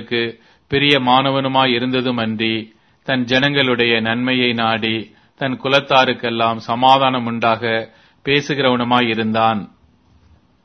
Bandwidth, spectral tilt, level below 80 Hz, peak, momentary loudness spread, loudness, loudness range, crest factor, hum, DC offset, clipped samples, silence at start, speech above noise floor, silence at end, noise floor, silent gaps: 6.6 kHz; -5.5 dB/octave; -54 dBFS; 0 dBFS; 9 LU; -16 LUFS; 1 LU; 18 dB; none; under 0.1%; under 0.1%; 0 s; 36 dB; 1 s; -53 dBFS; none